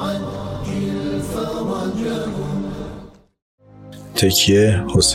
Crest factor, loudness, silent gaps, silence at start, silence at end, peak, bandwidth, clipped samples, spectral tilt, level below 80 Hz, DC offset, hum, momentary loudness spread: 18 dB; -19 LUFS; 3.42-3.58 s; 0 s; 0 s; -4 dBFS; 16 kHz; under 0.1%; -4.5 dB/octave; -40 dBFS; under 0.1%; none; 18 LU